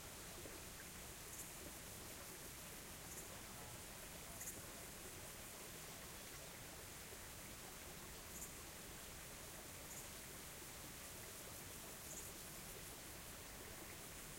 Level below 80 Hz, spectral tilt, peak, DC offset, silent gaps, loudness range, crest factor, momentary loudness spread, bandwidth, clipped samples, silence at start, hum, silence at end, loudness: -66 dBFS; -2.5 dB/octave; -36 dBFS; under 0.1%; none; 1 LU; 18 dB; 2 LU; 16.5 kHz; under 0.1%; 0 s; none; 0 s; -52 LUFS